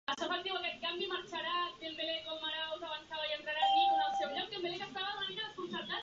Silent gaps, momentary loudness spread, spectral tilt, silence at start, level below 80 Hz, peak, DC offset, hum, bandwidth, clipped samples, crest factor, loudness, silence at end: none; 9 LU; 1 dB/octave; 0.1 s; -74 dBFS; -20 dBFS; under 0.1%; none; 7.6 kHz; under 0.1%; 18 dB; -36 LUFS; 0 s